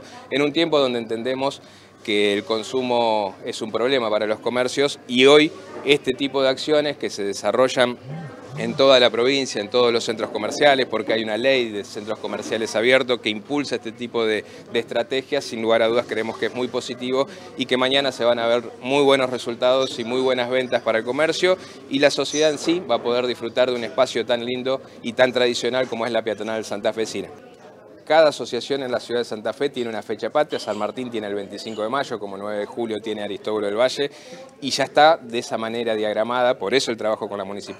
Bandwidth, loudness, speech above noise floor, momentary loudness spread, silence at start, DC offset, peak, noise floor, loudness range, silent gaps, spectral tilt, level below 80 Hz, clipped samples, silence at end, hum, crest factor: 13.5 kHz; -21 LUFS; 23 dB; 11 LU; 0 s; under 0.1%; 0 dBFS; -45 dBFS; 6 LU; none; -3.5 dB/octave; -70 dBFS; under 0.1%; 0 s; none; 22 dB